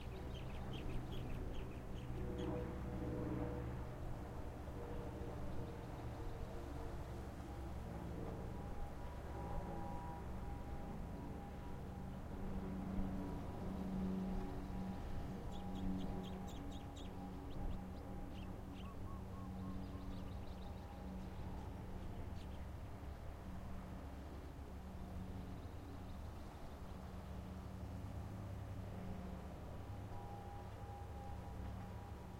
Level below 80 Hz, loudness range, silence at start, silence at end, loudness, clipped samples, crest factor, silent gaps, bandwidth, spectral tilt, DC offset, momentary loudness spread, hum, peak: -52 dBFS; 6 LU; 0 s; 0 s; -49 LUFS; under 0.1%; 18 dB; none; 16 kHz; -7.5 dB/octave; under 0.1%; 7 LU; none; -28 dBFS